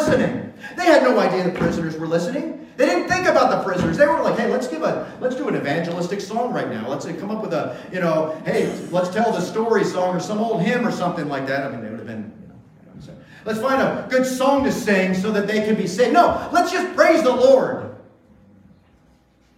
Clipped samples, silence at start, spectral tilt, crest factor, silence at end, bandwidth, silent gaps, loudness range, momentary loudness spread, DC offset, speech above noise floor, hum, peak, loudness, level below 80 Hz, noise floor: under 0.1%; 0 s; -5.5 dB/octave; 18 dB; 1.55 s; 15.5 kHz; none; 6 LU; 12 LU; under 0.1%; 37 dB; none; -2 dBFS; -20 LUFS; -52 dBFS; -56 dBFS